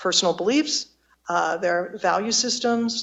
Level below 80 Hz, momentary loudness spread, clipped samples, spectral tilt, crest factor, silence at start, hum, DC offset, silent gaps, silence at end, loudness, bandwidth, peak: -66 dBFS; 6 LU; under 0.1%; -2 dB/octave; 18 dB; 0 s; none; under 0.1%; none; 0 s; -22 LUFS; 8.6 kHz; -6 dBFS